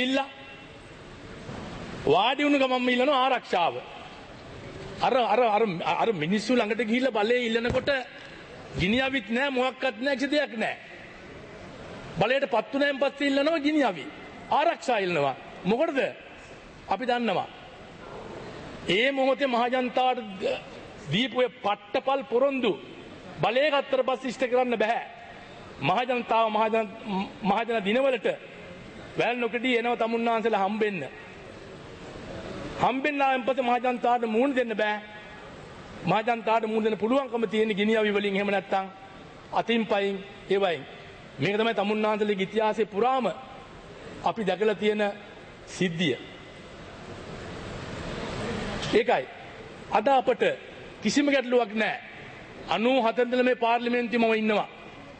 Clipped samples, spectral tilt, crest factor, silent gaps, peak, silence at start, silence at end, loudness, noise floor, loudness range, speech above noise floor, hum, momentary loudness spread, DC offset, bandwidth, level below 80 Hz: under 0.1%; -5 dB/octave; 18 dB; none; -8 dBFS; 0 s; 0 s; -26 LUFS; -46 dBFS; 4 LU; 21 dB; none; 20 LU; under 0.1%; 8.8 kHz; -56 dBFS